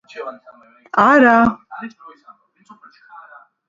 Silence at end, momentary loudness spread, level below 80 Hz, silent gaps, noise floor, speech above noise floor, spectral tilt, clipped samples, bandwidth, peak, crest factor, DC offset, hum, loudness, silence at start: 1.8 s; 23 LU; -54 dBFS; none; -49 dBFS; 32 dB; -6.5 dB/octave; under 0.1%; 7.6 kHz; 0 dBFS; 18 dB; under 0.1%; none; -13 LUFS; 0.15 s